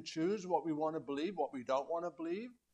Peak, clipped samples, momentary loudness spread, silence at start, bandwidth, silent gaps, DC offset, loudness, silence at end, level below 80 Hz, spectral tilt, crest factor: -22 dBFS; under 0.1%; 6 LU; 0 s; 8.8 kHz; none; under 0.1%; -39 LUFS; 0.2 s; -80 dBFS; -5.5 dB/octave; 18 dB